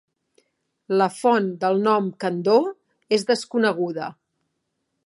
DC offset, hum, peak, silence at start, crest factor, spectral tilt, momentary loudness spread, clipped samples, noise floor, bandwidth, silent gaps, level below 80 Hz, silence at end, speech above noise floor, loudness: under 0.1%; none; -4 dBFS; 0.9 s; 18 dB; -5.5 dB/octave; 8 LU; under 0.1%; -76 dBFS; 11.5 kHz; none; -76 dBFS; 0.95 s; 55 dB; -22 LUFS